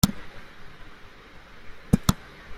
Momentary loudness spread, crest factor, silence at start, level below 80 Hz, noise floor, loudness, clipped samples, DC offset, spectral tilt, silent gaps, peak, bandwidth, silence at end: 24 LU; 26 dB; 0.05 s; -40 dBFS; -46 dBFS; -26 LUFS; under 0.1%; under 0.1%; -5 dB/octave; none; -4 dBFS; 16 kHz; 0 s